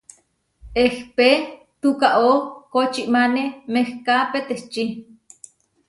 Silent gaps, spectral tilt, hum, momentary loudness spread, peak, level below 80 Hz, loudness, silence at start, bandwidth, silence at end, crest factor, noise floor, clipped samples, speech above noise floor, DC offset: none; -4 dB/octave; none; 10 LU; -2 dBFS; -52 dBFS; -20 LUFS; 0.65 s; 11.5 kHz; 0.85 s; 18 dB; -61 dBFS; under 0.1%; 42 dB; under 0.1%